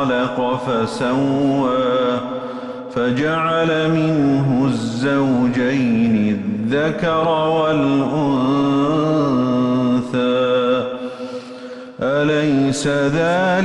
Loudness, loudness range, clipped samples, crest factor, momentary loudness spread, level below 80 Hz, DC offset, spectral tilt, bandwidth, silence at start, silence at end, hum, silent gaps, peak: -18 LUFS; 2 LU; under 0.1%; 10 dB; 9 LU; -50 dBFS; under 0.1%; -6.5 dB/octave; 11 kHz; 0 s; 0 s; none; none; -8 dBFS